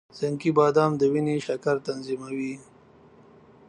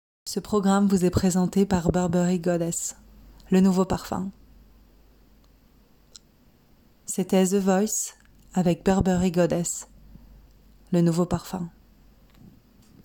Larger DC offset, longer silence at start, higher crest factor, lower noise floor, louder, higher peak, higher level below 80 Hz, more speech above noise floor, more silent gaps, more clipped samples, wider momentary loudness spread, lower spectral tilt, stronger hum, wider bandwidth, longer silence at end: neither; about the same, 0.15 s vs 0.25 s; about the same, 18 dB vs 18 dB; second, -54 dBFS vs -58 dBFS; about the same, -25 LUFS vs -24 LUFS; about the same, -8 dBFS vs -6 dBFS; second, -68 dBFS vs -48 dBFS; second, 29 dB vs 36 dB; neither; neither; about the same, 12 LU vs 12 LU; about the same, -7 dB/octave vs -6 dB/octave; neither; second, 10 kHz vs 17.5 kHz; second, 1.05 s vs 1.35 s